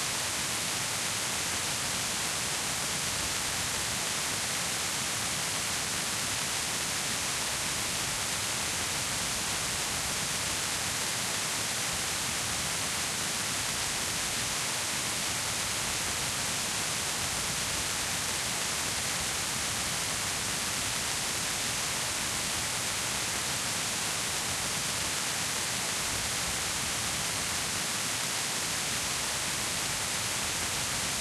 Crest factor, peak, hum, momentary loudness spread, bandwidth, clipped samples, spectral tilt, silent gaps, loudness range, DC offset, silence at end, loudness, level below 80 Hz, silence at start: 18 dB; -14 dBFS; none; 0 LU; 16 kHz; under 0.1%; -1 dB/octave; none; 0 LU; under 0.1%; 0 s; -29 LUFS; -54 dBFS; 0 s